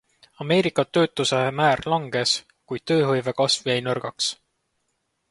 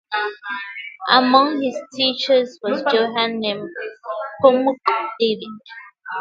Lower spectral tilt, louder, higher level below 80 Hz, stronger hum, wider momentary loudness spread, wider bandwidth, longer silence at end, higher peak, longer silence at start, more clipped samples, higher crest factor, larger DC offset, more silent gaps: about the same, -4 dB/octave vs -4.5 dB/octave; second, -22 LUFS vs -19 LUFS; first, -60 dBFS vs -70 dBFS; neither; second, 7 LU vs 16 LU; first, 11.5 kHz vs 7.4 kHz; first, 0.95 s vs 0 s; second, -6 dBFS vs 0 dBFS; first, 0.4 s vs 0.1 s; neither; about the same, 18 dB vs 20 dB; neither; neither